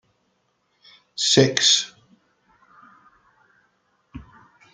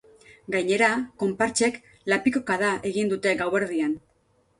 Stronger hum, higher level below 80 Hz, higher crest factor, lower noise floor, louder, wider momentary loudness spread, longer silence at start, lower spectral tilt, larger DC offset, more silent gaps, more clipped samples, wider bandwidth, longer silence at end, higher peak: neither; about the same, -58 dBFS vs -62 dBFS; first, 24 dB vs 18 dB; first, -69 dBFS vs -65 dBFS; first, -17 LUFS vs -24 LUFS; first, 28 LU vs 8 LU; first, 1.15 s vs 0.5 s; second, -2.5 dB/octave vs -4 dB/octave; neither; neither; neither; second, 10 kHz vs 11.5 kHz; about the same, 0.55 s vs 0.6 s; first, -2 dBFS vs -8 dBFS